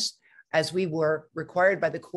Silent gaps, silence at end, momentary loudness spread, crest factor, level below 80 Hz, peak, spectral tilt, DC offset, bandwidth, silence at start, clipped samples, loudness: none; 0 s; 8 LU; 18 dB; -72 dBFS; -10 dBFS; -4 dB/octave; under 0.1%; 12.5 kHz; 0 s; under 0.1%; -26 LUFS